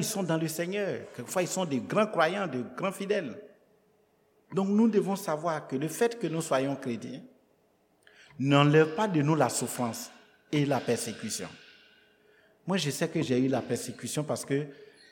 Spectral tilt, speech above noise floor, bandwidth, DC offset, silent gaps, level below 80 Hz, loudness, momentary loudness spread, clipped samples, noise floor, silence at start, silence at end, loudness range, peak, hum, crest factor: -5 dB/octave; 39 dB; 19 kHz; under 0.1%; none; -76 dBFS; -29 LUFS; 12 LU; under 0.1%; -68 dBFS; 0 s; 0.25 s; 5 LU; -8 dBFS; none; 22 dB